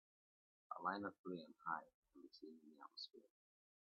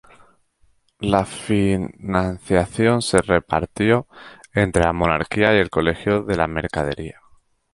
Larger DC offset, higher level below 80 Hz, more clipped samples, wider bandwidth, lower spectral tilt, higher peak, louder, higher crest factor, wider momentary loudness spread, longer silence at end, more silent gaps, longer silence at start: neither; second, under -90 dBFS vs -38 dBFS; neither; second, 6.4 kHz vs 11.5 kHz; second, -2.5 dB/octave vs -5.5 dB/octave; second, -28 dBFS vs 0 dBFS; second, -51 LUFS vs -20 LUFS; first, 26 dB vs 20 dB; first, 17 LU vs 8 LU; about the same, 0.65 s vs 0.6 s; first, 1.19-1.24 s, 1.94-2.02 s vs none; second, 0.7 s vs 1 s